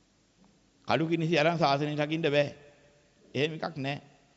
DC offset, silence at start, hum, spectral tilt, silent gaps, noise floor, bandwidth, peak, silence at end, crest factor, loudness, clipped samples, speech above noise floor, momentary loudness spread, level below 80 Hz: under 0.1%; 0.85 s; none; -6 dB/octave; none; -64 dBFS; 8 kHz; -12 dBFS; 0.35 s; 18 dB; -29 LUFS; under 0.1%; 36 dB; 11 LU; -68 dBFS